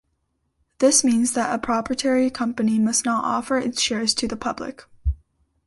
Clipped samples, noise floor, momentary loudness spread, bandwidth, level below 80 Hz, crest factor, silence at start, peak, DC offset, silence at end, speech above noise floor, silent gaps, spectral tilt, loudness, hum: under 0.1%; -72 dBFS; 12 LU; 12 kHz; -38 dBFS; 18 dB; 0.8 s; -4 dBFS; under 0.1%; 0.5 s; 51 dB; none; -3 dB/octave; -21 LUFS; none